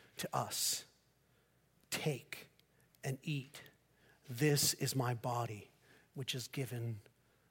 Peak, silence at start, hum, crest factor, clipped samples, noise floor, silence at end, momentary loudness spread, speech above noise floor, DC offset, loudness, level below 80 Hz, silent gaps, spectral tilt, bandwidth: -20 dBFS; 0.15 s; none; 22 dB; under 0.1%; -73 dBFS; 0.5 s; 18 LU; 35 dB; under 0.1%; -38 LUFS; -78 dBFS; none; -3.5 dB/octave; 17 kHz